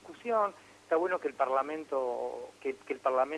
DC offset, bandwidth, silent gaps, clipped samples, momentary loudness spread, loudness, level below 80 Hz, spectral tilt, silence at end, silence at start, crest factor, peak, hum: under 0.1%; 11.5 kHz; none; under 0.1%; 9 LU; -33 LUFS; -78 dBFS; -4.5 dB/octave; 0 s; 0.05 s; 18 dB; -16 dBFS; 50 Hz at -70 dBFS